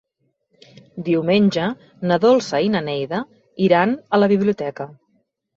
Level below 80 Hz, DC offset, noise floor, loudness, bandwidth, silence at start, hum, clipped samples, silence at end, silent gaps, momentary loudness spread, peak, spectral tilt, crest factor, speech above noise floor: -62 dBFS; under 0.1%; -69 dBFS; -19 LUFS; 7.6 kHz; 0.95 s; none; under 0.1%; 0.65 s; none; 14 LU; -2 dBFS; -6.5 dB/octave; 18 dB; 51 dB